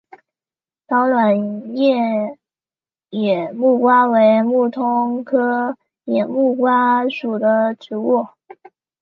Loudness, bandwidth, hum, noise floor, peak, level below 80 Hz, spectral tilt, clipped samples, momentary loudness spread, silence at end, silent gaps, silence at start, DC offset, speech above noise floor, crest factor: -17 LUFS; 5.6 kHz; none; under -90 dBFS; -2 dBFS; -74 dBFS; -8.5 dB/octave; under 0.1%; 10 LU; 0.75 s; none; 0.9 s; under 0.1%; over 74 dB; 14 dB